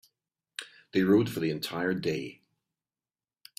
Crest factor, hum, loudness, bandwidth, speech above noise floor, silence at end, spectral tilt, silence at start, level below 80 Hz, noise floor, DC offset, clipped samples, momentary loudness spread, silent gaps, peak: 20 dB; none; -29 LUFS; 16 kHz; over 62 dB; 1.25 s; -6 dB/octave; 0.6 s; -68 dBFS; under -90 dBFS; under 0.1%; under 0.1%; 18 LU; none; -12 dBFS